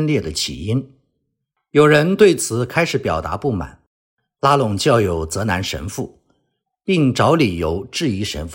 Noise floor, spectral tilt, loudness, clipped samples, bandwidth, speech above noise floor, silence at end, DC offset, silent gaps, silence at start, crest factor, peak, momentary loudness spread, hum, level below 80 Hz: -74 dBFS; -5 dB/octave; -18 LUFS; under 0.1%; 16.5 kHz; 57 dB; 0 s; under 0.1%; 3.87-4.17 s; 0 s; 18 dB; 0 dBFS; 12 LU; none; -44 dBFS